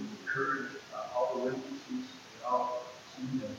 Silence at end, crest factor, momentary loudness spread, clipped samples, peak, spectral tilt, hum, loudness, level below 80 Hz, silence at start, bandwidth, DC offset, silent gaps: 0 s; 18 dB; 10 LU; under 0.1%; -18 dBFS; -5 dB/octave; none; -36 LUFS; -78 dBFS; 0 s; 16 kHz; under 0.1%; none